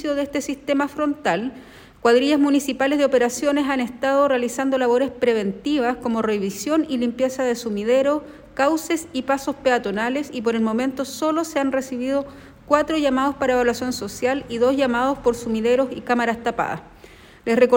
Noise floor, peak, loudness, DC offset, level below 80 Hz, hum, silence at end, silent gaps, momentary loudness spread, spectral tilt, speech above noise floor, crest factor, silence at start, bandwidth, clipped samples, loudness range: -46 dBFS; -2 dBFS; -21 LUFS; under 0.1%; -52 dBFS; none; 0 s; none; 6 LU; -4.5 dB/octave; 25 dB; 18 dB; 0 s; 17 kHz; under 0.1%; 3 LU